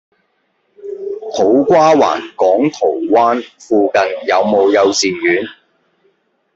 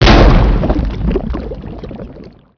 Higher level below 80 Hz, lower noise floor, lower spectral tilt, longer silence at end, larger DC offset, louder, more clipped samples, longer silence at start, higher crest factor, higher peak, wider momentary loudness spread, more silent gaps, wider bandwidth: second, -60 dBFS vs -14 dBFS; first, -63 dBFS vs -35 dBFS; second, -4 dB/octave vs -7 dB/octave; first, 1.05 s vs 0.3 s; neither; about the same, -13 LUFS vs -13 LUFS; second, under 0.1% vs 1%; first, 0.8 s vs 0 s; about the same, 14 dB vs 12 dB; about the same, 0 dBFS vs 0 dBFS; second, 15 LU vs 21 LU; neither; first, 8 kHz vs 5.4 kHz